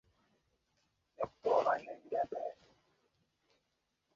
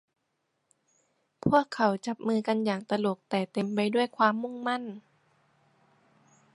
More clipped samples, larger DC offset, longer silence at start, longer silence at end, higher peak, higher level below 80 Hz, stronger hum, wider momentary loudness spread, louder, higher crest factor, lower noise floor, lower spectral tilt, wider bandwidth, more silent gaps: neither; neither; second, 1.2 s vs 1.45 s; about the same, 1.65 s vs 1.55 s; second, -18 dBFS vs -8 dBFS; second, -76 dBFS vs -66 dBFS; neither; first, 12 LU vs 7 LU; second, -37 LUFS vs -28 LUFS; about the same, 22 dB vs 22 dB; first, -83 dBFS vs -78 dBFS; second, -3 dB/octave vs -6 dB/octave; second, 7.4 kHz vs 11.5 kHz; neither